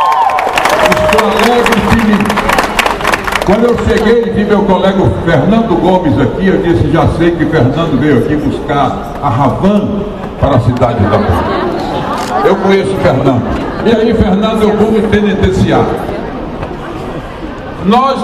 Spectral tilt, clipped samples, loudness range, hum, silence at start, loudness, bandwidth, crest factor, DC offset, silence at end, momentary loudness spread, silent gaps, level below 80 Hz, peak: -6.5 dB/octave; 0.3%; 2 LU; none; 0 s; -10 LUFS; 15.5 kHz; 10 dB; under 0.1%; 0 s; 8 LU; none; -26 dBFS; 0 dBFS